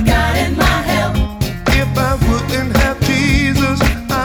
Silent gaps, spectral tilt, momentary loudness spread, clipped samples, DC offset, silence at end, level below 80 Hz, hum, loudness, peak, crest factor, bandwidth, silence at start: none; -5.5 dB/octave; 4 LU; under 0.1%; under 0.1%; 0 s; -20 dBFS; none; -15 LUFS; 0 dBFS; 14 dB; over 20 kHz; 0 s